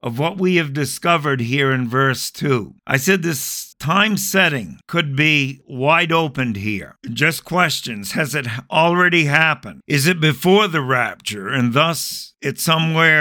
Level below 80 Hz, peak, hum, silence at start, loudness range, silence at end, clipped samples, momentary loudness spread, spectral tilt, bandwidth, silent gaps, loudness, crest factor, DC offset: -56 dBFS; 0 dBFS; none; 0.05 s; 2 LU; 0 s; under 0.1%; 10 LU; -4.5 dB/octave; 19 kHz; none; -17 LUFS; 18 dB; under 0.1%